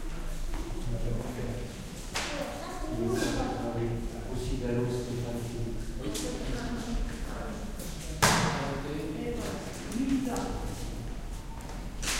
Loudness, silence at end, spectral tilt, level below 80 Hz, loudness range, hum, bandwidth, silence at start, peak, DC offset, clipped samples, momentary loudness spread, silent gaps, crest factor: -34 LUFS; 0 s; -4.5 dB/octave; -38 dBFS; 4 LU; none; 16 kHz; 0 s; -6 dBFS; under 0.1%; under 0.1%; 10 LU; none; 26 dB